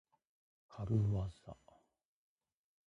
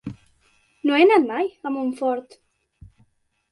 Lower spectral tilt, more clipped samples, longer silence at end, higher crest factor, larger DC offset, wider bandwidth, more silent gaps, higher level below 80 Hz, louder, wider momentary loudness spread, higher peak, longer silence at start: first, -9.5 dB/octave vs -6 dB/octave; neither; about the same, 1.35 s vs 1.3 s; about the same, 20 dB vs 18 dB; neither; second, 7.4 kHz vs 11.5 kHz; neither; about the same, -58 dBFS vs -60 dBFS; second, -39 LUFS vs -21 LUFS; first, 23 LU vs 13 LU; second, -22 dBFS vs -4 dBFS; first, 0.7 s vs 0.05 s